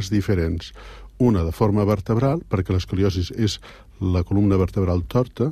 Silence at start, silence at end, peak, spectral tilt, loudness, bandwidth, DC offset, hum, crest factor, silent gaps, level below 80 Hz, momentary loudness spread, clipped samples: 0 s; 0 s; -6 dBFS; -7.5 dB/octave; -22 LUFS; 14 kHz; under 0.1%; none; 16 dB; none; -38 dBFS; 7 LU; under 0.1%